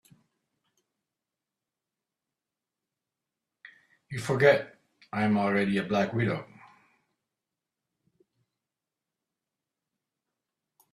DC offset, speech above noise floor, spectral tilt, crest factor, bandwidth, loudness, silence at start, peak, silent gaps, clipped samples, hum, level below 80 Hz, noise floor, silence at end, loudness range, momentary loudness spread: under 0.1%; 63 dB; -6.5 dB/octave; 26 dB; 12.5 kHz; -27 LUFS; 4.1 s; -6 dBFS; none; under 0.1%; none; -70 dBFS; -89 dBFS; 4.5 s; 11 LU; 15 LU